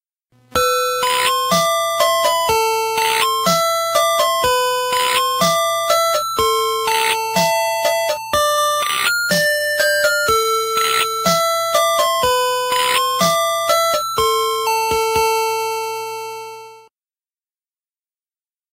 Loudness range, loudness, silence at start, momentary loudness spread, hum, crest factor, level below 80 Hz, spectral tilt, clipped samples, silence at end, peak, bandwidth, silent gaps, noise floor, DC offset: 4 LU; -16 LUFS; 0.55 s; 3 LU; none; 16 dB; -50 dBFS; -1.5 dB/octave; under 0.1%; 1.95 s; -2 dBFS; 16 kHz; none; under -90 dBFS; under 0.1%